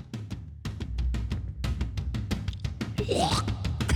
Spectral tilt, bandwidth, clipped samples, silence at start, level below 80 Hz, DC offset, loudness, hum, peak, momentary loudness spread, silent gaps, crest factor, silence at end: -5.5 dB/octave; 17.5 kHz; under 0.1%; 0 s; -36 dBFS; under 0.1%; -32 LUFS; none; -12 dBFS; 12 LU; none; 18 dB; 0 s